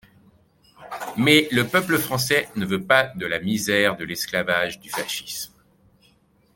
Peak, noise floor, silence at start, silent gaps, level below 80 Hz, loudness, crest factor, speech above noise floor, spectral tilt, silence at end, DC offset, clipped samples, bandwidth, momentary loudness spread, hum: -2 dBFS; -60 dBFS; 0.8 s; none; -58 dBFS; -21 LUFS; 22 dB; 38 dB; -3.5 dB/octave; 1.1 s; under 0.1%; under 0.1%; 17 kHz; 14 LU; none